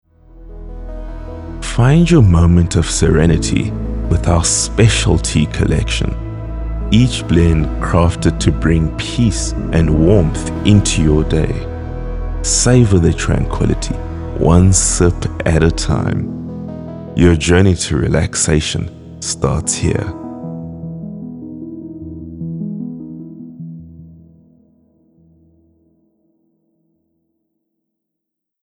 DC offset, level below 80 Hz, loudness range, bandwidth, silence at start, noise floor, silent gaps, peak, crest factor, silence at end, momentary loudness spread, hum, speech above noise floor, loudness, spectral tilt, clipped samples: under 0.1%; -24 dBFS; 15 LU; 11.5 kHz; 0.35 s; -79 dBFS; none; 0 dBFS; 14 dB; 4.5 s; 18 LU; none; 66 dB; -14 LUFS; -5.5 dB/octave; under 0.1%